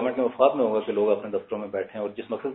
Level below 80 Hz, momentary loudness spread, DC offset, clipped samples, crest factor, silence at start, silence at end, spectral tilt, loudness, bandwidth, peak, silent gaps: -70 dBFS; 10 LU; under 0.1%; under 0.1%; 20 dB; 0 s; 0 s; -4.5 dB/octave; -26 LUFS; 4 kHz; -6 dBFS; none